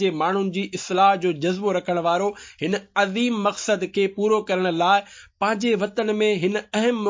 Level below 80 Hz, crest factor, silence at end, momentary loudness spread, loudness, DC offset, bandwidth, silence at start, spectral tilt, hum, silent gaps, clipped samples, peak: -66 dBFS; 16 dB; 0 s; 7 LU; -22 LUFS; under 0.1%; 7.6 kHz; 0 s; -5 dB/octave; none; none; under 0.1%; -6 dBFS